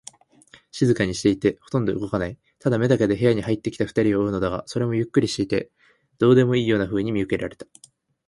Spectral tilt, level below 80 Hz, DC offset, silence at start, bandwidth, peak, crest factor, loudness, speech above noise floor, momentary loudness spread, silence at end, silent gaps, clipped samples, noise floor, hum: -6.5 dB/octave; -50 dBFS; under 0.1%; 0.75 s; 11.5 kHz; -4 dBFS; 18 dB; -22 LUFS; 32 dB; 9 LU; 0.65 s; none; under 0.1%; -53 dBFS; none